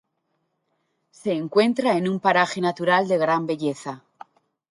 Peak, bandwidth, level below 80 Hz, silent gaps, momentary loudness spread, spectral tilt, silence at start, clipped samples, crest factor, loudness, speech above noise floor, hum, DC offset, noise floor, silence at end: -4 dBFS; 11.5 kHz; -72 dBFS; none; 12 LU; -5.5 dB/octave; 1.25 s; under 0.1%; 20 dB; -22 LUFS; 52 dB; none; under 0.1%; -74 dBFS; 0.75 s